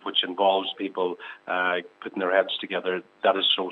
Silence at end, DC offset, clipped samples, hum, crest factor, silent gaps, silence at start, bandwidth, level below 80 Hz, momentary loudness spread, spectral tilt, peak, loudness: 0 s; under 0.1%; under 0.1%; none; 20 dB; none; 0.05 s; 5.4 kHz; -88 dBFS; 8 LU; -5.5 dB/octave; -6 dBFS; -25 LUFS